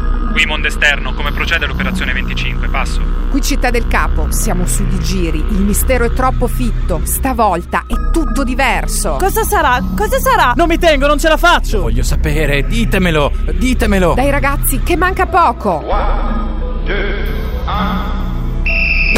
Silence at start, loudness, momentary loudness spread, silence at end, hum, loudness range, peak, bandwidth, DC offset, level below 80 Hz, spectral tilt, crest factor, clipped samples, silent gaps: 0 s; -14 LUFS; 7 LU; 0 s; none; 4 LU; 0 dBFS; 16.5 kHz; under 0.1%; -16 dBFS; -4.5 dB/octave; 12 dB; under 0.1%; none